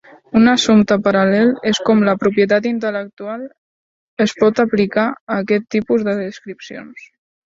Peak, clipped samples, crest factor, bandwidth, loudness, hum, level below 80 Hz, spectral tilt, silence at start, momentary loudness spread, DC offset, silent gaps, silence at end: 0 dBFS; under 0.1%; 16 dB; 7.8 kHz; -15 LUFS; none; -56 dBFS; -5.5 dB/octave; 0.35 s; 18 LU; under 0.1%; 3.13-3.17 s, 3.58-4.17 s, 5.21-5.27 s; 0.55 s